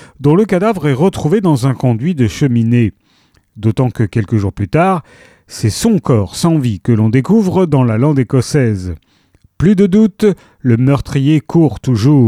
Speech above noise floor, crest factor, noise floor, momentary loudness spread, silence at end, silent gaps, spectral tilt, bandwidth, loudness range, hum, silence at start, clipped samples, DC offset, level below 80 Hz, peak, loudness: 42 dB; 12 dB; -53 dBFS; 6 LU; 0 s; none; -7.5 dB/octave; 14.5 kHz; 3 LU; none; 0.2 s; under 0.1%; under 0.1%; -38 dBFS; 0 dBFS; -13 LUFS